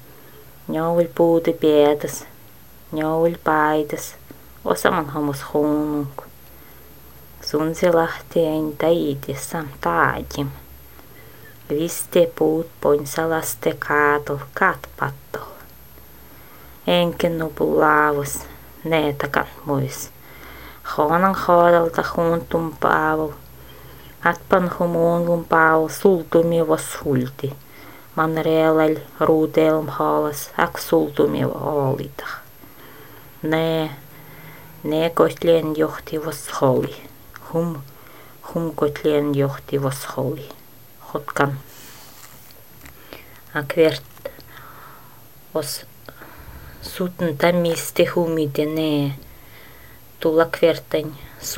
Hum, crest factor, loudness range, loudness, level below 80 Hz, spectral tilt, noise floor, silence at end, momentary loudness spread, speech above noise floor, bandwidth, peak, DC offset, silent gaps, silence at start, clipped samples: none; 22 dB; 7 LU; -20 LUFS; -50 dBFS; -5.5 dB/octave; -47 dBFS; 0 s; 22 LU; 27 dB; 16.5 kHz; 0 dBFS; 0.5%; none; 0.35 s; under 0.1%